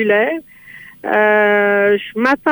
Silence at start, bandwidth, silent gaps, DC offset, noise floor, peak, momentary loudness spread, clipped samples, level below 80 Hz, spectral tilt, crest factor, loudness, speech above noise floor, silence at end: 0 s; over 20 kHz; none; under 0.1%; -39 dBFS; -2 dBFS; 9 LU; under 0.1%; -58 dBFS; -6.5 dB/octave; 12 dB; -14 LUFS; 25 dB; 0 s